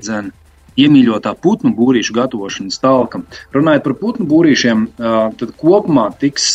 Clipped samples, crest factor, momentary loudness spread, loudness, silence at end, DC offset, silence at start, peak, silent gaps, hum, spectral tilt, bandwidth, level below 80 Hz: under 0.1%; 12 dB; 12 LU; -13 LUFS; 0 s; under 0.1%; 0 s; 0 dBFS; none; none; -5 dB/octave; 8.8 kHz; -50 dBFS